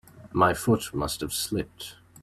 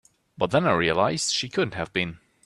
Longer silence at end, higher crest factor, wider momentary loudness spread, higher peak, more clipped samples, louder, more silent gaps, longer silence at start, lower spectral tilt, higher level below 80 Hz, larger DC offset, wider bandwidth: second, 0.05 s vs 0.3 s; about the same, 20 dB vs 20 dB; first, 16 LU vs 7 LU; about the same, -8 dBFS vs -6 dBFS; neither; about the same, -26 LUFS vs -24 LUFS; neither; second, 0.15 s vs 0.4 s; about the same, -4.5 dB/octave vs -4 dB/octave; first, -50 dBFS vs -56 dBFS; neither; first, 16 kHz vs 12.5 kHz